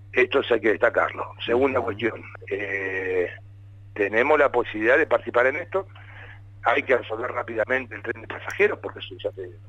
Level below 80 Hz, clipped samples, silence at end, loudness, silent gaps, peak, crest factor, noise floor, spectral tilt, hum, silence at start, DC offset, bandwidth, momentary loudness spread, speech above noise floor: -56 dBFS; under 0.1%; 0 s; -24 LUFS; none; -6 dBFS; 18 dB; -44 dBFS; -6 dB/octave; none; 0 s; under 0.1%; 11 kHz; 13 LU; 21 dB